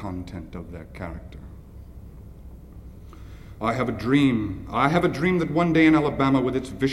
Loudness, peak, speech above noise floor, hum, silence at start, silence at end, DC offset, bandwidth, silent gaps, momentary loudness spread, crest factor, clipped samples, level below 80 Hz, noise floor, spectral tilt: -22 LUFS; -6 dBFS; 20 dB; none; 0 s; 0 s; under 0.1%; 12.5 kHz; none; 26 LU; 20 dB; under 0.1%; -44 dBFS; -42 dBFS; -7 dB/octave